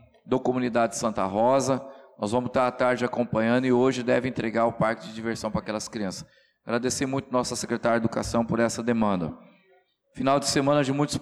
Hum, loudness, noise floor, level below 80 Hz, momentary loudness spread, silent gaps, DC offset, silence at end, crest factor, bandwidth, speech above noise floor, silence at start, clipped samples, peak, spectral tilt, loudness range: none; -26 LUFS; -63 dBFS; -54 dBFS; 9 LU; none; under 0.1%; 0 s; 14 dB; 13.5 kHz; 38 dB; 0.25 s; under 0.1%; -12 dBFS; -5 dB/octave; 4 LU